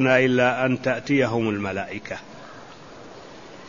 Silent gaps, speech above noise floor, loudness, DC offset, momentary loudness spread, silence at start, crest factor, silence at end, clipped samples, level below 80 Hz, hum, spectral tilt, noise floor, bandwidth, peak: none; 21 dB; -22 LUFS; 0.3%; 24 LU; 0 s; 20 dB; 0 s; under 0.1%; -58 dBFS; none; -6 dB/octave; -43 dBFS; 7.4 kHz; -4 dBFS